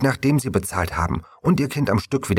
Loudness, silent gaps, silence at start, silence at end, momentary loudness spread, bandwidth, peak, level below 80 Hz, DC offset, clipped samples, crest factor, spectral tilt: -22 LUFS; none; 0 s; 0 s; 5 LU; 16.5 kHz; -6 dBFS; -38 dBFS; under 0.1%; under 0.1%; 16 dB; -6 dB/octave